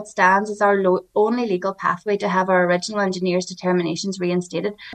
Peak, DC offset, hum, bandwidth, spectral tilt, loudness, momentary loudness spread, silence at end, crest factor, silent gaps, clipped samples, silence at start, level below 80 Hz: -4 dBFS; under 0.1%; none; 9.4 kHz; -5.5 dB/octave; -20 LUFS; 7 LU; 0 s; 16 dB; none; under 0.1%; 0 s; -66 dBFS